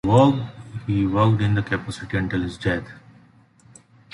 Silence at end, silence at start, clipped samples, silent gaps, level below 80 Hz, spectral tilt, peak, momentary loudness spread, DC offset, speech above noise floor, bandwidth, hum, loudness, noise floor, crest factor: 1.15 s; 0.05 s; under 0.1%; none; -44 dBFS; -7.5 dB/octave; -4 dBFS; 12 LU; under 0.1%; 33 dB; 11 kHz; none; -22 LUFS; -53 dBFS; 18 dB